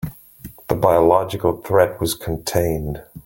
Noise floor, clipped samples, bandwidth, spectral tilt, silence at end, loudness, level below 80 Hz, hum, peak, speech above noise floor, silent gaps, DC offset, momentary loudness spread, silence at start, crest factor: -41 dBFS; under 0.1%; 17 kHz; -5.5 dB/octave; 0.05 s; -19 LUFS; -40 dBFS; none; -2 dBFS; 22 dB; none; under 0.1%; 16 LU; 0 s; 18 dB